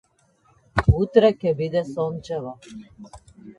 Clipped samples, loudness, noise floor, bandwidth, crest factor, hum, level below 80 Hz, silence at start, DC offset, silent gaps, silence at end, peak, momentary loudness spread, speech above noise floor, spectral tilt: under 0.1%; -22 LUFS; -61 dBFS; 10.5 kHz; 20 dB; none; -36 dBFS; 0.75 s; under 0.1%; none; 0.05 s; -2 dBFS; 22 LU; 39 dB; -8 dB/octave